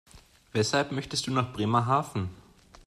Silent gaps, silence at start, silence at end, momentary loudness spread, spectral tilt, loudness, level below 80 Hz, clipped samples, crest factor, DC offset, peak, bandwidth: none; 0.15 s; 0.05 s; 9 LU; -5 dB/octave; -28 LUFS; -58 dBFS; under 0.1%; 18 dB; under 0.1%; -10 dBFS; 14.5 kHz